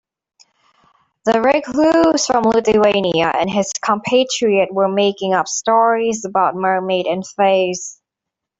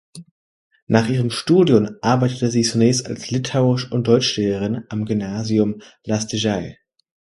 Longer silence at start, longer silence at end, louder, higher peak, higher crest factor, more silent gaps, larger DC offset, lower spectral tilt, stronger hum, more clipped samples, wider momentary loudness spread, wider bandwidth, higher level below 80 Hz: first, 1.25 s vs 0.15 s; about the same, 0.65 s vs 0.65 s; first, -16 LUFS vs -19 LUFS; about the same, -2 dBFS vs 0 dBFS; second, 14 dB vs 20 dB; second, none vs 0.31-0.71 s, 0.82-0.87 s; neither; second, -4 dB/octave vs -5.5 dB/octave; neither; neither; second, 5 LU vs 8 LU; second, 8.2 kHz vs 11.5 kHz; about the same, -54 dBFS vs -52 dBFS